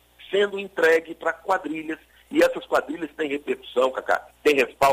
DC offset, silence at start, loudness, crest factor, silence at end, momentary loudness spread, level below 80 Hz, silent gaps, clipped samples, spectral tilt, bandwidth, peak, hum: under 0.1%; 0.2 s; -24 LUFS; 16 dB; 0 s; 10 LU; -60 dBFS; none; under 0.1%; -3.5 dB/octave; 16 kHz; -8 dBFS; none